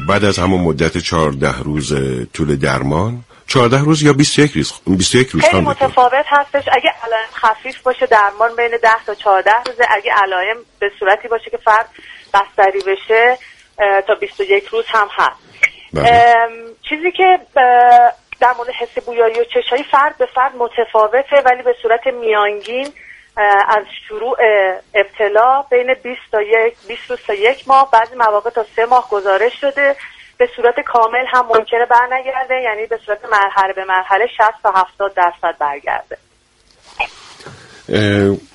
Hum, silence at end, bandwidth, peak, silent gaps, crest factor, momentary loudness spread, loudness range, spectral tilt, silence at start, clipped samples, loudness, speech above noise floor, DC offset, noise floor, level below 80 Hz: none; 0.15 s; 11.5 kHz; 0 dBFS; none; 14 dB; 9 LU; 3 LU; -4.5 dB/octave; 0 s; under 0.1%; -14 LUFS; 40 dB; under 0.1%; -53 dBFS; -42 dBFS